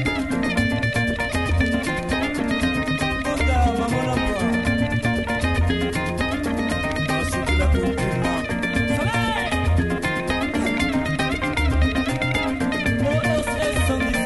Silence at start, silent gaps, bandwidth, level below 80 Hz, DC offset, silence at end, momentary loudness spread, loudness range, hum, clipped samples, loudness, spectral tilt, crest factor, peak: 0 s; none; 12 kHz; -30 dBFS; under 0.1%; 0 s; 3 LU; 1 LU; none; under 0.1%; -22 LUFS; -5.5 dB/octave; 16 dB; -6 dBFS